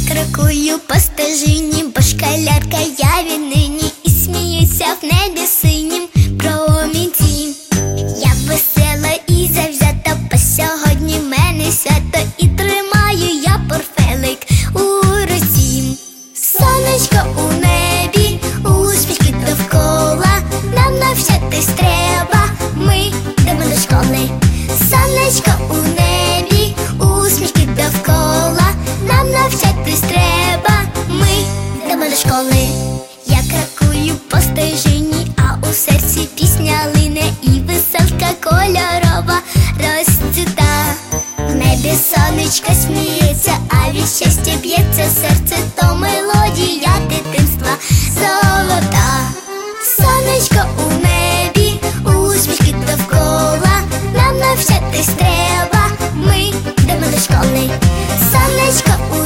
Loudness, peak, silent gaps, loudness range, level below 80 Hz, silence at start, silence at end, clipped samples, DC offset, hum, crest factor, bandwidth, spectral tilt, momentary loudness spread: -13 LUFS; 0 dBFS; none; 1 LU; -22 dBFS; 0 s; 0 s; under 0.1%; under 0.1%; none; 12 dB; 16.5 kHz; -4.5 dB/octave; 4 LU